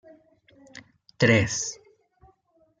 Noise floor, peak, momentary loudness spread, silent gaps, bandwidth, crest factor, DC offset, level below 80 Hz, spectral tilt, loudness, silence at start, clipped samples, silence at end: -65 dBFS; -6 dBFS; 27 LU; none; 9.6 kHz; 24 dB; under 0.1%; -58 dBFS; -4.5 dB/octave; -23 LUFS; 0.75 s; under 0.1%; 1.05 s